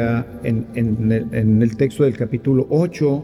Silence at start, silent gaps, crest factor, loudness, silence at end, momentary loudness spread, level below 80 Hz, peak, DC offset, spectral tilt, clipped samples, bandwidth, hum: 0 s; none; 12 dB; -19 LUFS; 0 s; 6 LU; -44 dBFS; -4 dBFS; under 0.1%; -9 dB/octave; under 0.1%; 12 kHz; none